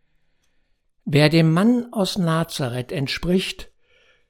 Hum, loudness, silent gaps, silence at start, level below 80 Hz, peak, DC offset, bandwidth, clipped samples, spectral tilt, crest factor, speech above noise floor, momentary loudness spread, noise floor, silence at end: none; -20 LUFS; none; 1.05 s; -46 dBFS; -2 dBFS; under 0.1%; 16.5 kHz; under 0.1%; -6 dB/octave; 20 dB; 45 dB; 11 LU; -64 dBFS; 0.65 s